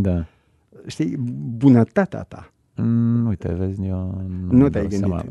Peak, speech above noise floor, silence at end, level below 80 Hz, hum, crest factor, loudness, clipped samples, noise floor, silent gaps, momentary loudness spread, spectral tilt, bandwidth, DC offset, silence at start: -2 dBFS; 30 dB; 0 s; -42 dBFS; none; 18 dB; -20 LUFS; under 0.1%; -50 dBFS; none; 15 LU; -9 dB/octave; 9.8 kHz; under 0.1%; 0 s